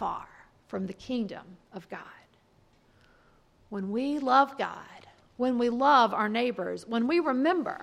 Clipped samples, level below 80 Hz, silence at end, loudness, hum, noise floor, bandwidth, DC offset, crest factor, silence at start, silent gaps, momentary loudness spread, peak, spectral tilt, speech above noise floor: under 0.1%; -66 dBFS; 0 s; -27 LUFS; none; -64 dBFS; 11.5 kHz; under 0.1%; 20 dB; 0 s; none; 21 LU; -8 dBFS; -6 dB/octave; 36 dB